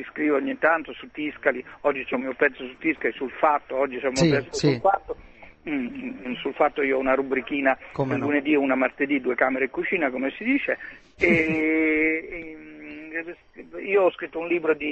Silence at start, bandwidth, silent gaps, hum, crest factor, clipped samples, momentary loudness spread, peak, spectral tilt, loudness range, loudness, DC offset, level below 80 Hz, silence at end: 0 s; 8.4 kHz; none; none; 20 dB; under 0.1%; 14 LU; -6 dBFS; -5.5 dB/octave; 2 LU; -24 LUFS; under 0.1%; -56 dBFS; 0 s